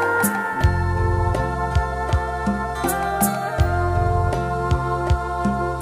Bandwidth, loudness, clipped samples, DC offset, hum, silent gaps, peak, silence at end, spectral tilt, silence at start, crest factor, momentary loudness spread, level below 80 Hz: 15.5 kHz; -21 LUFS; under 0.1%; under 0.1%; none; none; -4 dBFS; 0 s; -6 dB/octave; 0 s; 16 dB; 3 LU; -28 dBFS